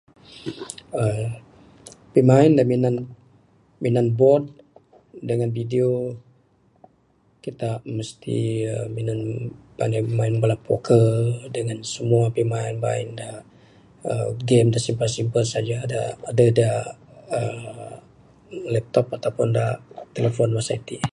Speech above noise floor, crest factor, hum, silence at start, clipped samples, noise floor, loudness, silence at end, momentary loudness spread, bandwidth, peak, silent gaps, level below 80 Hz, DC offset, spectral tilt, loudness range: 40 dB; 22 dB; none; 0.3 s; under 0.1%; -61 dBFS; -22 LUFS; 0.05 s; 18 LU; 11.5 kHz; -2 dBFS; none; -56 dBFS; under 0.1%; -7 dB/octave; 7 LU